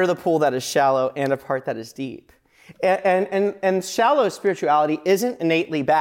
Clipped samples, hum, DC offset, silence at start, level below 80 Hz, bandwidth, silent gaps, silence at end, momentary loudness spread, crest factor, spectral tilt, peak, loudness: under 0.1%; none; under 0.1%; 0 s; -68 dBFS; 17 kHz; none; 0 s; 7 LU; 12 dB; -5 dB/octave; -8 dBFS; -21 LUFS